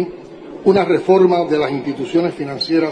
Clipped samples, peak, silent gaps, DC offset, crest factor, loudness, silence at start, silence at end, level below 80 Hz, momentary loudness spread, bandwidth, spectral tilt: under 0.1%; -2 dBFS; none; under 0.1%; 14 dB; -16 LUFS; 0 s; 0 s; -54 dBFS; 12 LU; 9.4 kHz; -7 dB/octave